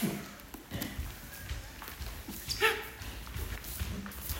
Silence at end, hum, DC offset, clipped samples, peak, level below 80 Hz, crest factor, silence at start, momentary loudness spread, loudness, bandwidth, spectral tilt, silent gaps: 0 s; none; under 0.1%; under 0.1%; -12 dBFS; -46 dBFS; 26 dB; 0 s; 14 LU; -37 LUFS; 16.5 kHz; -3.5 dB/octave; none